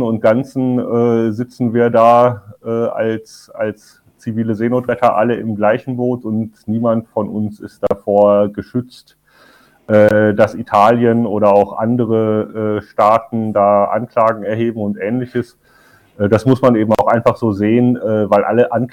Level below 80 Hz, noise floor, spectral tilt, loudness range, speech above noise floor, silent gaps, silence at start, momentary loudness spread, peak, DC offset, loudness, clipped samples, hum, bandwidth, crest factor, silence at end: -54 dBFS; -49 dBFS; -8.5 dB/octave; 4 LU; 35 dB; none; 0 s; 11 LU; 0 dBFS; under 0.1%; -15 LUFS; under 0.1%; none; 13.5 kHz; 14 dB; 0.05 s